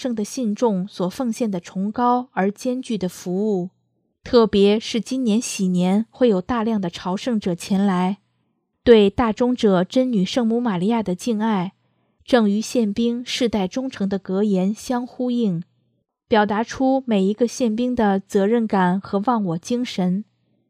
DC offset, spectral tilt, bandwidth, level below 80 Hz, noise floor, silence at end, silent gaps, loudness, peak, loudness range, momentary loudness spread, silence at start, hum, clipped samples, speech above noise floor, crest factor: under 0.1%; -6 dB/octave; 14.5 kHz; -52 dBFS; -70 dBFS; 0.45 s; none; -21 LUFS; 0 dBFS; 4 LU; 7 LU; 0 s; none; under 0.1%; 50 dB; 20 dB